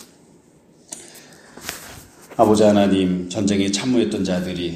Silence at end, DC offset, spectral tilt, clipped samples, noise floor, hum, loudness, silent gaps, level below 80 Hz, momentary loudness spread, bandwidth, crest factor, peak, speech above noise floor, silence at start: 0 s; under 0.1%; -5.5 dB/octave; under 0.1%; -52 dBFS; none; -18 LUFS; none; -52 dBFS; 21 LU; 15.5 kHz; 20 dB; 0 dBFS; 34 dB; 0 s